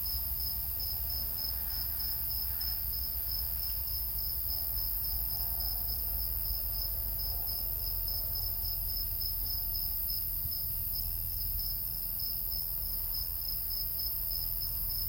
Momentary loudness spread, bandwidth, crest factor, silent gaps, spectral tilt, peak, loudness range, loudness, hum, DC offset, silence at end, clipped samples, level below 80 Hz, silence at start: 1 LU; 17 kHz; 16 dB; none; -2.5 dB/octave; -18 dBFS; 1 LU; -32 LUFS; none; under 0.1%; 0 s; under 0.1%; -42 dBFS; 0 s